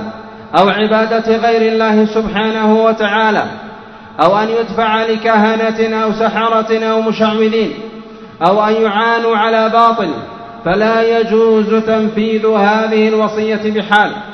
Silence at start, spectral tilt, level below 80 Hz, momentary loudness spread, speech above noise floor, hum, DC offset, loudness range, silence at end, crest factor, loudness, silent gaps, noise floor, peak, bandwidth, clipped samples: 0 s; -6 dB/octave; -46 dBFS; 7 LU; 20 dB; none; under 0.1%; 2 LU; 0 s; 12 dB; -12 LUFS; none; -32 dBFS; 0 dBFS; 6.4 kHz; under 0.1%